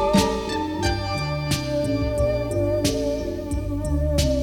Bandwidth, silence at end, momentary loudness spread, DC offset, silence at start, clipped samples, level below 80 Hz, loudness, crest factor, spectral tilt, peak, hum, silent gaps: 17.5 kHz; 0 s; 5 LU; under 0.1%; 0 s; under 0.1%; -30 dBFS; -24 LUFS; 16 dB; -5.5 dB/octave; -6 dBFS; none; none